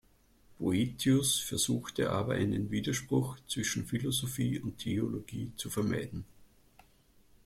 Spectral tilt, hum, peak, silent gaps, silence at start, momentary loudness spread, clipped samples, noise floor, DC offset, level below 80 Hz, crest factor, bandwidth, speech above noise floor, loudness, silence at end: -4.5 dB/octave; none; -18 dBFS; none; 0.6 s; 8 LU; under 0.1%; -64 dBFS; under 0.1%; -58 dBFS; 16 dB; 16.5 kHz; 31 dB; -33 LUFS; 1 s